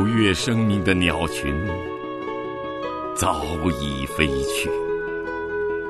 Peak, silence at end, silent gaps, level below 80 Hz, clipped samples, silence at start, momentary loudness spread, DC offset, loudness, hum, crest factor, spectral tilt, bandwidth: -2 dBFS; 0 s; none; -38 dBFS; under 0.1%; 0 s; 10 LU; under 0.1%; -23 LUFS; none; 22 dB; -5 dB/octave; 12.5 kHz